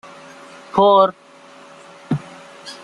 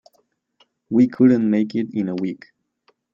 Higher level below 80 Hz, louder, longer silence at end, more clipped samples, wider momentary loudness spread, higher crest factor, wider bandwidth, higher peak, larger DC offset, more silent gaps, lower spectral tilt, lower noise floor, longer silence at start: first, -60 dBFS vs -66 dBFS; about the same, -17 LUFS vs -19 LUFS; second, 0.1 s vs 0.75 s; neither; first, 27 LU vs 12 LU; about the same, 18 dB vs 18 dB; first, 11 kHz vs 7 kHz; about the same, -2 dBFS vs -4 dBFS; neither; neither; second, -6.5 dB/octave vs -9 dB/octave; second, -44 dBFS vs -66 dBFS; second, 0.75 s vs 0.9 s